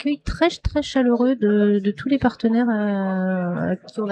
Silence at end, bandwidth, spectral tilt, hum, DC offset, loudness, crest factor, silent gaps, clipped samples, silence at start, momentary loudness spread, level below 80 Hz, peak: 0 s; 8.8 kHz; -7 dB/octave; none; under 0.1%; -21 LUFS; 16 dB; none; under 0.1%; 0 s; 7 LU; -38 dBFS; -4 dBFS